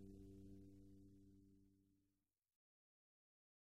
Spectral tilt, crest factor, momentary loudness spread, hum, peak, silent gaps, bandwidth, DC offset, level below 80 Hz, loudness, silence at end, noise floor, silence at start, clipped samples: -8 dB/octave; 16 dB; 6 LU; none; -50 dBFS; none; 12 kHz; under 0.1%; -76 dBFS; -65 LUFS; 1.05 s; under -90 dBFS; 0 s; under 0.1%